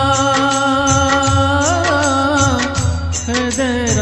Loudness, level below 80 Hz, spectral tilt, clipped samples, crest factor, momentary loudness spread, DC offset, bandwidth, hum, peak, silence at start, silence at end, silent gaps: -14 LUFS; -30 dBFS; -4 dB/octave; under 0.1%; 14 dB; 5 LU; under 0.1%; 12 kHz; none; 0 dBFS; 0 s; 0 s; none